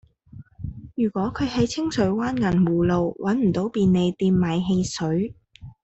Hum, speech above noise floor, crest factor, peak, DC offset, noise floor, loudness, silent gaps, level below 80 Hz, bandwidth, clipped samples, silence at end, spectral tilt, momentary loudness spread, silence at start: none; 24 dB; 14 dB; -8 dBFS; under 0.1%; -46 dBFS; -23 LUFS; none; -46 dBFS; 8.2 kHz; under 0.1%; 0.1 s; -7 dB/octave; 7 LU; 0.35 s